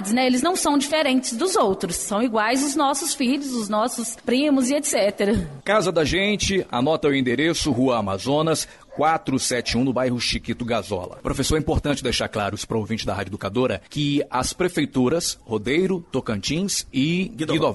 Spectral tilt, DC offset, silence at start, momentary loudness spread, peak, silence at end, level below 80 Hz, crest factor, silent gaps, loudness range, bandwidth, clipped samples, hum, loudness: -4 dB/octave; under 0.1%; 0 s; 6 LU; -8 dBFS; 0 s; -42 dBFS; 14 dB; none; 3 LU; 12 kHz; under 0.1%; none; -22 LUFS